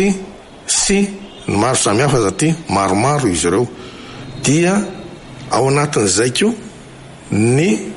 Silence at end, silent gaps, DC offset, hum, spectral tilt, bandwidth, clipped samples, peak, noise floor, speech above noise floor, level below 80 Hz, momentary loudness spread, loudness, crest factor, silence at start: 0 s; none; under 0.1%; none; -4.5 dB/octave; 11.5 kHz; under 0.1%; -2 dBFS; -36 dBFS; 21 dB; -42 dBFS; 18 LU; -15 LUFS; 14 dB; 0 s